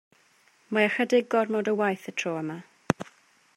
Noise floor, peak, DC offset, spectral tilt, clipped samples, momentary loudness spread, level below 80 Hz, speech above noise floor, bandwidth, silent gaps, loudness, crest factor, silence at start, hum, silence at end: -63 dBFS; -2 dBFS; under 0.1%; -5 dB/octave; under 0.1%; 11 LU; -66 dBFS; 37 dB; 15.5 kHz; none; -27 LUFS; 26 dB; 0.7 s; none; 0.55 s